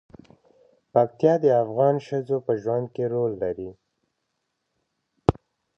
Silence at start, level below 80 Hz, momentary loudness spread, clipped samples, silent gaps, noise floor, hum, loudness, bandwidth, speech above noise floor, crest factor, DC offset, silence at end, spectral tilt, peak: 0.95 s; -50 dBFS; 9 LU; under 0.1%; none; -78 dBFS; none; -24 LUFS; 6.8 kHz; 55 dB; 24 dB; under 0.1%; 0.45 s; -9 dB/octave; 0 dBFS